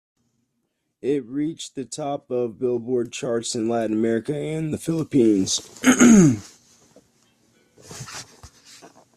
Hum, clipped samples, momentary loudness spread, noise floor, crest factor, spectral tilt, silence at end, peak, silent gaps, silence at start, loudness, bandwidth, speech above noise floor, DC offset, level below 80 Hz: none; under 0.1%; 18 LU; -75 dBFS; 20 dB; -5 dB/octave; 0.3 s; -2 dBFS; none; 1.05 s; -21 LUFS; 14 kHz; 54 dB; under 0.1%; -56 dBFS